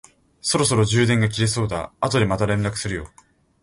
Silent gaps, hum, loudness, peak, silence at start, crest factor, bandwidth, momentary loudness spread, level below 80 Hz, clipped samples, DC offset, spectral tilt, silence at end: none; none; -21 LUFS; -4 dBFS; 0.45 s; 16 dB; 11.5 kHz; 10 LU; -44 dBFS; under 0.1%; under 0.1%; -4.5 dB/octave; 0.55 s